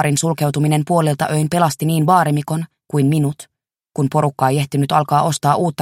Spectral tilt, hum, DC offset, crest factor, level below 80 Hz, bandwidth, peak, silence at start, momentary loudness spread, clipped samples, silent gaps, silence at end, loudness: -6 dB/octave; none; under 0.1%; 16 dB; -56 dBFS; 16 kHz; 0 dBFS; 0 s; 8 LU; under 0.1%; none; 0 s; -17 LUFS